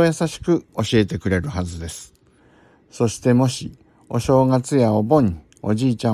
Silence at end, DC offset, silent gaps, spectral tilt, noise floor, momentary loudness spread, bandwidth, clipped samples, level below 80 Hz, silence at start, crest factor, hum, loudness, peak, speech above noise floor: 0 s; under 0.1%; none; -6.5 dB/octave; -54 dBFS; 13 LU; 13.5 kHz; under 0.1%; -46 dBFS; 0 s; 18 dB; none; -20 LUFS; -2 dBFS; 35 dB